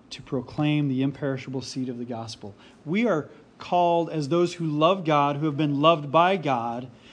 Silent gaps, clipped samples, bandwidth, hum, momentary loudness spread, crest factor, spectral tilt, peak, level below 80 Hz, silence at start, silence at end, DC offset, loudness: none; under 0.1%; 10 kHz; none; 14 LU; 22 dB; -6.5 dB/octave; -4 dBFS; -66 dBFS; 0.1 s; 0.2 s; under 0.1%; -25 LUFS